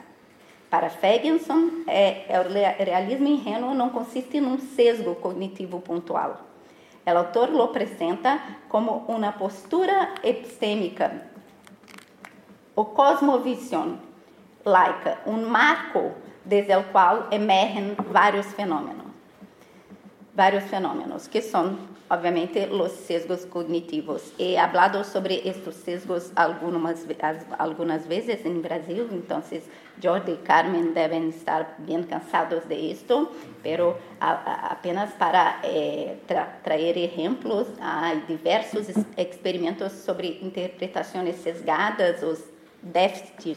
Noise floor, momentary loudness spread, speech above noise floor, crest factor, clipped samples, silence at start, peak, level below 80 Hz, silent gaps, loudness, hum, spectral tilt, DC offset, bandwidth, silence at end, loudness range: -53 dBFS; 11 LU; 28 dB; 20 dB; under 0.1%; 0.7 s; -6 dBFS; -78 dBFS; none; -24 LUFS; none; -5.5 dB/octave; under 0.1%; 15.5 kHz; 0 s; 5 LU